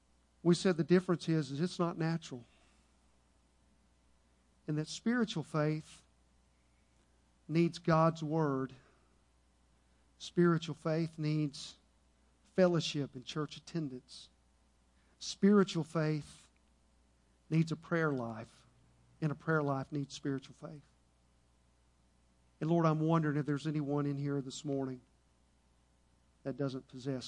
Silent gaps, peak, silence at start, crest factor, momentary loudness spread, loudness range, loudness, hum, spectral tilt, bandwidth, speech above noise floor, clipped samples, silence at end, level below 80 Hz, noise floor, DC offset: none; -14 dBFS; 0.45 s; 22 dB; 15 LU; 5 LU; -35 LUFS; none; -6.5 dB/octave; 10.5 kHz; 37 dB; under 0.1%; 0 s; -70 dBFS; -70 dBFS; under 0.1%